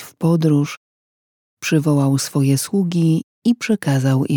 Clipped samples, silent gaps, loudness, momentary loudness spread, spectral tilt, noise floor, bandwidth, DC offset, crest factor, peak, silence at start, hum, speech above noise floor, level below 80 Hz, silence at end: under 0.1%; 0.77-1.57 s, 3.23-3.42 s; -18 LUFS; 4 LU; -6.5 dB/octave; under -90 dBFS; 19.5 kHz; under 0.1%; 14 dB; -4 dBFS; 0 s; none; over 74 dB; -66 dBFS; 0 s